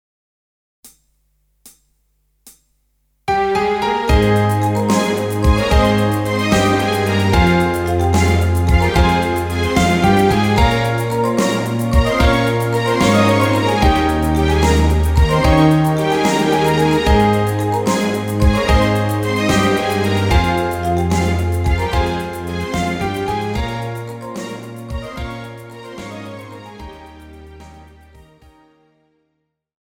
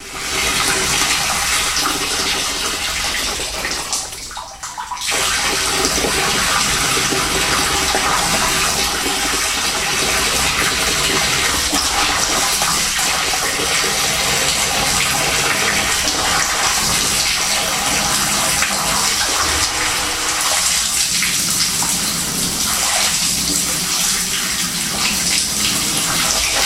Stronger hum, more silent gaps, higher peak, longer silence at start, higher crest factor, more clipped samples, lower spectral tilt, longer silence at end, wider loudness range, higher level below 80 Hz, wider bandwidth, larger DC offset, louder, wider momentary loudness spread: neither; neither; about the same, -2 dBFS vs 0 dBFS; first, 0.85 s vs 0 s; about the same, 16 dB vs 18 dB; neither; first, -6 dB/octave vs -0.5 dB/octave; first, 2.1 s vs 0 s; first, 13 LU vs 3 LU; first, -24 dBFS vs -36 dBFS; first, 19.5 kHz vs 16 kHz; neither; about the same, -16 LUFS vs -15 LUFS; first, 15 LU vs 3 LU